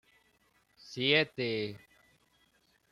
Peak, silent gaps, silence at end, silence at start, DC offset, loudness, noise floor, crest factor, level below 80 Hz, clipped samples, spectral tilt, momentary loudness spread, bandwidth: -12 dBFS; none; 1.15 s; 0.85 s; under 0.1%; -30 LUFS; -71 dBFS; 24 dB; -74 dBFS; under 0.1%; -5 dB/octave; 19 LU; 13.5 kHz